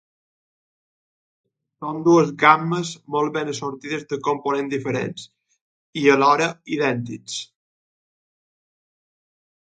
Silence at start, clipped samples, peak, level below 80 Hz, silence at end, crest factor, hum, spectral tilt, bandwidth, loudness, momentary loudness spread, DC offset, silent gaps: 1.8 s; under 0.1%; 0 dBFS; -68 dBFS; 2.15 s; 24 dB; none; -5 dB/octave; 9.4 kHz; -21 LUFS; 15 LU; under 0.1%; 5.61-5.93 s